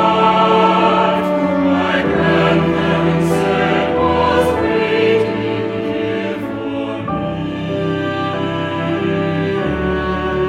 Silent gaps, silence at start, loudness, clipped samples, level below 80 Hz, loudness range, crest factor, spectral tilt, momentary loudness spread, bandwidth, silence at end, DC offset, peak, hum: none; 0 s; -16 LUFS; under 0.1%; -38 dBFS; 6 LU; 14 dB; -7 dB/octave; 9 LU; 14 kHz; 0 s; under 0.1%; 0 dBFS; none